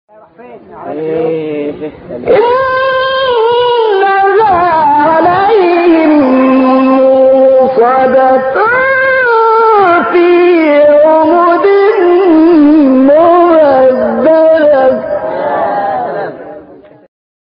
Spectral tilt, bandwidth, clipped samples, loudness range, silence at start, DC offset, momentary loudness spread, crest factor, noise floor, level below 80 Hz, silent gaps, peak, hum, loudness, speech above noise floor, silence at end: -3 dB/octave; 5.4 kHz; under 0.1%; 5 LU; 0.4 s; under 0.1%; 10 LU; 8 dB; -35 dBFS; -48 dBFS; none; 0 dBFS; none; -7 LUFS; 25 dB; 1 s